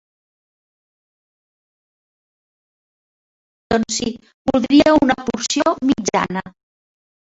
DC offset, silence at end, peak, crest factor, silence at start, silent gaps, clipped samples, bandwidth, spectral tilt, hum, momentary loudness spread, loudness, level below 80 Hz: under 0.1%; 0.9 s; -2 dBFS; 20 dB; 3.7 s; 4.34-4.45 s; under 0.1%; 8 kHz; -4 dB/octave; none; 12 LU; -17 LUFS; -50 dBFS